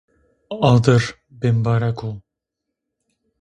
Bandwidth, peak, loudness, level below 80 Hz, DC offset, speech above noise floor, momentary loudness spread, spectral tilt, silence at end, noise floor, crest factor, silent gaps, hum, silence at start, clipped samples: 9 kHz; -2 dBFS; -18 LUFS; -50 dBFS; under 0.1%; 64 dB; 17 LU; -7 dB/octave; 1.2 s; -81 dBFS; 18 dB; none; none; 0.5 s; under 0.1%